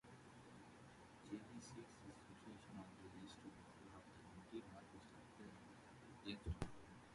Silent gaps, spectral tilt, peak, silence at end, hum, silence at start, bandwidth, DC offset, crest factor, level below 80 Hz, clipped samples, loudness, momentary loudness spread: none; -5.5 dB/octave; -30 dBFS; 0 s; none; 0.05 s; 11.5 kHz; under 0.1%; 28 dB; -66 dBFS; under 0.1%; -58 LUFS; 11 LU